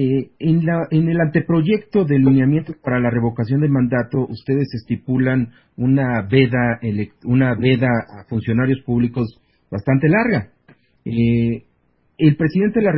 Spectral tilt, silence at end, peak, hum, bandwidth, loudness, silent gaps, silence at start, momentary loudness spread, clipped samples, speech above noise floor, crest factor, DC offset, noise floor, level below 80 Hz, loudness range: -13 dB/octave; 0 s; -2 dBFS; none; 5.8 kHz; -18 LUFS; none; 0 s; 9 LU; under 0.1%; 45 dB; 16 dB; under 0.1%; -62 dBFS; -46 dBFS; 3 LU